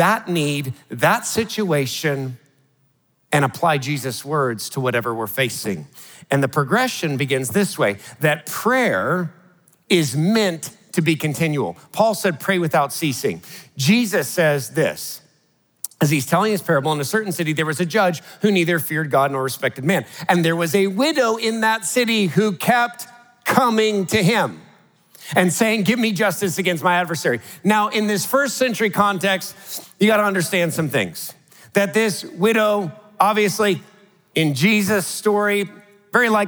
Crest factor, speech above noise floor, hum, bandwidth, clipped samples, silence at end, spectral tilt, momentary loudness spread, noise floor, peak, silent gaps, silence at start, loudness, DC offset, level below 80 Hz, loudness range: 20 dB; 43 dB; none; over 20 kHz; under 0.1%; 0 s; -4.5 dB/octave; 8 LU; -62 dBFS; 0 dBFS; none; 0 s; -19 LUFS; under 0.1%; -68 dBFS; 3 LU